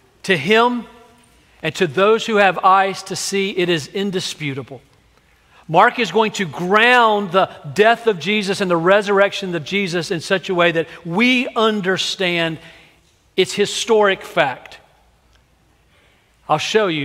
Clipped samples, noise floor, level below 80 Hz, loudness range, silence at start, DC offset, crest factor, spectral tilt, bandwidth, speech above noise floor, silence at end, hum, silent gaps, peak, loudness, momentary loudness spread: under 0.1%; -56 dBFS; -60 dBFS; 5 LU; 0.25 s; under 0.1%; 18 dB; -4 dB/octave; 16 kHz; 39 dB; 0 s; none; none; 0 dBFS; -17 LUFS; 10 LU